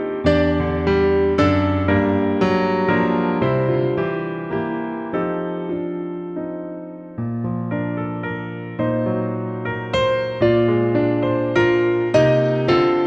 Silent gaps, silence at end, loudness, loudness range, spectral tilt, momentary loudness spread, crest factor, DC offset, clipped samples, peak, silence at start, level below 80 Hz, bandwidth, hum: none; 0 s; -20 LUFS; 8 LU; -8 dB/octave; 11 LU; 16 dB; under 0.1%; under 0.1%; -4 dBFS; 0 s; -42 dBFS; 7.8 kHz; none